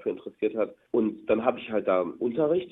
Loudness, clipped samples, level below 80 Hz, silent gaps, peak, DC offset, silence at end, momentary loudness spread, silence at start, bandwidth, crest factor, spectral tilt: -28 LUFS; under 0.1%; -66 dBFS; none; -8 dBFS; under 0.1%; 0 s; 5 LU; 0 s; 4 kHz; 20 dB; -9.5 dB/octave